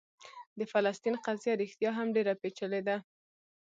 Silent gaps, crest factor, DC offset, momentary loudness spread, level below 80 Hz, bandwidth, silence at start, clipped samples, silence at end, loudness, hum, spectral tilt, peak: 0.47-0.56 s; 20 dB; under 0.1%; 11 LU; -84 dBFS; 7.8 kHz; 0.2 s; under 0.1%; 0.65 s; -33 LUFS; none; -5.5 dB/octave; -14 dBFS